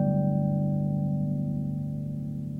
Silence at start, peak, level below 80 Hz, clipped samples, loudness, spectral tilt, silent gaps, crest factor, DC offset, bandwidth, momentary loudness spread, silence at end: 0 s; -16 dBFS; -52 dBFS; under 0.1%; -29 LUFS; -12 dB/octave; none; 12 dB; under 0.1%; 1.7 kHz; 8 LU; 0 s